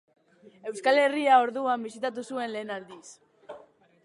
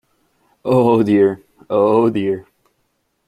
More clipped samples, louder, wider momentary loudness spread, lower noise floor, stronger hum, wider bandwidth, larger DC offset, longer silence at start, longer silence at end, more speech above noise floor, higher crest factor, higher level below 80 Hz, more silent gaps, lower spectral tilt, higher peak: neither; second, -26 LUFS vs -16 LUFS; first, 26 LU vs 13 LU; second, -54 dBFS vs -67 dBFS; neither; about the same, 11.5 kHz vs 11.5 kHz; neither; about the same, 0.65 s vs 0.65 s; second, 0.45 s vs 0.85 s; second, 28 dB vs 53 dB; about the same, 20 dB vs 16 dB; second, -84 dBFS vs -58 dBFS; neither; second, -3.5 dB/octave vs -8.5 dB/octave; second, -8 dBFS vs -2 dBFS